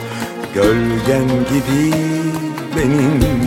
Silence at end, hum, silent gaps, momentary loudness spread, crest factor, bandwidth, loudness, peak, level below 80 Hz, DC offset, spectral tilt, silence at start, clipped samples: 0 s; none; none; 8 LU; 14 dB; 17 kHz; -16 LUFS; -2 dBFS; -32 dBFS; under 0.1%; -6.5 dB/octave; 0 s; under 0.1%